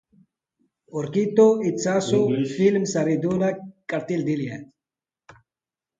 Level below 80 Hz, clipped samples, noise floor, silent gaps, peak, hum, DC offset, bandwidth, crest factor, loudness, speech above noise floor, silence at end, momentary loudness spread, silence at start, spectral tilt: -64 dBFS; under 0.1%; under -90 dBFS; none; -6 dBFS; none; under 0.1%; 9.2 kHz; 18 dB; -22 LUFS; over 69 dB; 1.35 s; 14 LU; 0.95 s; -6 dB/octave